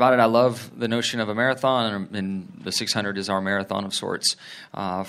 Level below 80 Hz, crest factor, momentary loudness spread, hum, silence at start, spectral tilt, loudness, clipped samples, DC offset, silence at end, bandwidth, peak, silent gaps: -70 dBFS; 20 dB; 11 LU; none; 0 s; -4 dB/octave; -24 LUFS; under 0.1%; under 0.1%; 0 s; 15.5 kHz; -2 dBFS; none